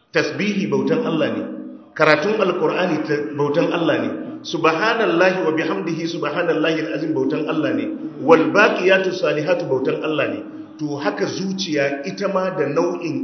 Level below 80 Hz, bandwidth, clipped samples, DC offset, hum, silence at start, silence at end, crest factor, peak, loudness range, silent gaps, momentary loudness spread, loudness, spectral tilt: -70 dBFS; 6.6 kHz; under 0.1%; under 0.1%; none; 0.15 s; 0 s; 20 dB; 0 dBFS; 4 LU; none; 9 LU; -19 LUFS; -5.5 dB/octave